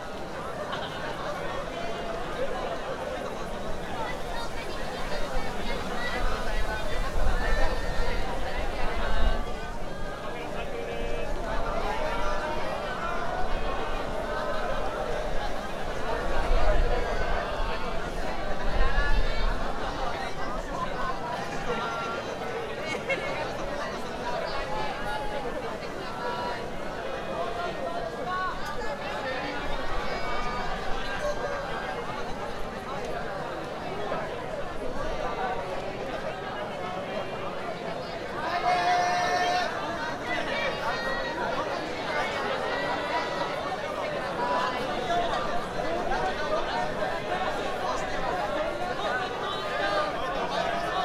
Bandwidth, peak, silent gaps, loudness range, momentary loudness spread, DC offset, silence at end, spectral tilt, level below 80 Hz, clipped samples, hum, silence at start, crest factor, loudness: 12.5 kHz; -8 dBFS; none; 5 LU; 6 LU; under 0.1%; 0 s; -4.5 dB/octave; -34 dBFS; under 0.1%; none; 0 s; 18 dB; -31 LUFS